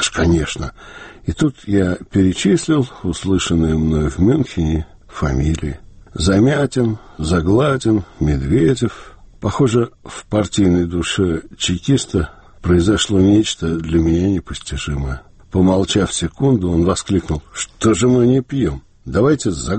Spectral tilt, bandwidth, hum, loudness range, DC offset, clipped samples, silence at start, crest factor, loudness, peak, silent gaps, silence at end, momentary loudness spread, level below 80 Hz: -6 dB/octave; 8.8 kHz; none; 2 LU; under 0.1%; under 0.1%; 0 s; 14 dB; -17 LUFS; -2 dBFS; none; 0 s; 11 LU; -30 dBFS